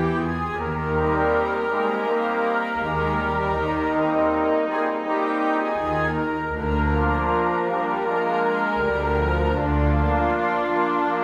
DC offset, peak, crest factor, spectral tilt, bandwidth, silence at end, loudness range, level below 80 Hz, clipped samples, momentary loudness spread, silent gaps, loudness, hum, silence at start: under 0.1%; -8 dBFS; 14 dB; -8 dB/octave; 7.4 kHz; 0 s; 1 LU; -32 dBFS; under 0.1%; 3 LU; none; -22 LUFS; none; 0 s